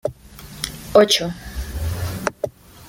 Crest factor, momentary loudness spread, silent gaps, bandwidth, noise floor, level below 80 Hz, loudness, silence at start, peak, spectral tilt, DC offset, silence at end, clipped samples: 20 dB; 17 LU; none; 17 kHz; -40 dBFS; -36 dBFS; -21 LUFS; 0.05 s; -2 dBFS; -4 dB/octave; under 0.1%; 0 s; under 0.1%